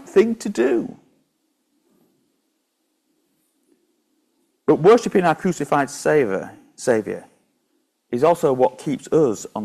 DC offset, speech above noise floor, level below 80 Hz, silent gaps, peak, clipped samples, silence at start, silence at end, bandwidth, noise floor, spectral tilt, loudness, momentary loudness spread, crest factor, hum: under 0.1%; 53 dB; -62 dBFS; none; -4 dBFS; under 0.1%; 0 s; 0 s; 14 kHz; -71 dBFS; -6 dB/octave; -19 LUFS; 13 LU; 18 dB; none